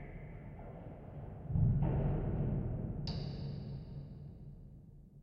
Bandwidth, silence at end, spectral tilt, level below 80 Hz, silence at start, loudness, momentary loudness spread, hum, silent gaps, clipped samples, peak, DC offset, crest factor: 6.2 kHz; 0 s; -8.5 dB/octave; -46 dBFS; 0 s; -38 LUFS; 20 LU; none; none; under 0.1%; -20 dBFS; under 0.1%; 20 dB